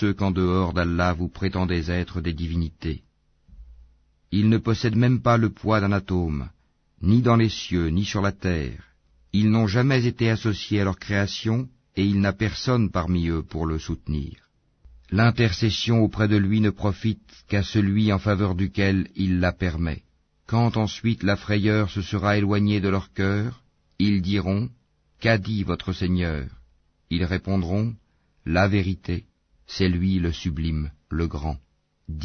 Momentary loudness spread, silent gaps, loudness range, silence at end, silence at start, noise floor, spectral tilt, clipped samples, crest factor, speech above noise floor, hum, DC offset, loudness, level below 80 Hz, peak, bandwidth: 10 LU; none; 4 LU; 0 s; 0 s; -59 dBFS; -7 dB/octave; under 0.1%; 18 dB; 36 dB; none; under 0.1%; -24 LUFS; -40 dBFS; -4 dBFS; 6.6 kHz